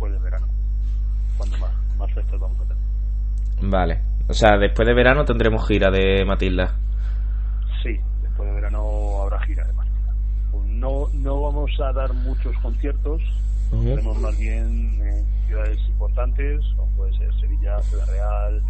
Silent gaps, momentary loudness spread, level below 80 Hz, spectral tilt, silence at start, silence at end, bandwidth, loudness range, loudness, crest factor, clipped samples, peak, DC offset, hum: none; 8 LU; -20 dBFS; -7 dB/octave; 0 s; 0 s; 7.8 kHz; 7 LU; -22 LUFS; 20 dB; under 0.1%; 0 dBFS; under 0.1%; 50 Hz at -20 dBFS